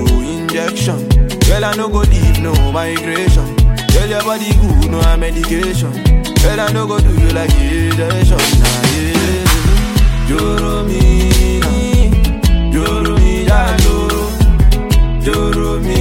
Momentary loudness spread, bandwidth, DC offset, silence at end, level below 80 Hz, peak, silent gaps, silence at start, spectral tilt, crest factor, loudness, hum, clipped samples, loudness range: 4 LU; 16.5 kHz; under 0.1%; 0 s; -14 dBFS; 0 dBFS; none; 0 s; -5.5 dB/octave; 10 dB; -13 LUFS; none; under 0.1%; 1 LU